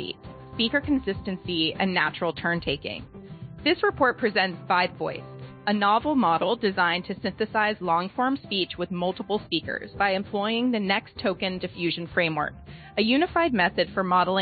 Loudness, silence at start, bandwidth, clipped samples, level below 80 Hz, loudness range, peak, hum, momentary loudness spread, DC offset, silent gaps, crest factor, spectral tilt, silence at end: -25 LUFS; 0 s; 4.9 kHz; under 0.1%; -54 dBFS; 3 LU; -8 dBFS; none; 11 LU; under 0.1%; none; 18 dB; -9.5 dB/octave; 0 s